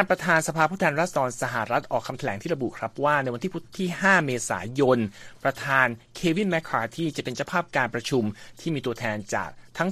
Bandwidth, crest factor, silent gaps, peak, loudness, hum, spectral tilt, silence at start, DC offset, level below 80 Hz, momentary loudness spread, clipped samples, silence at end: 15 kHz; 22 dB; none; -4 dBFS; -25 LUFS; none; -5 dB/octave; 0 s; under 0.1%; -58 dBFS; 9 LU; under 0.1%; 0 s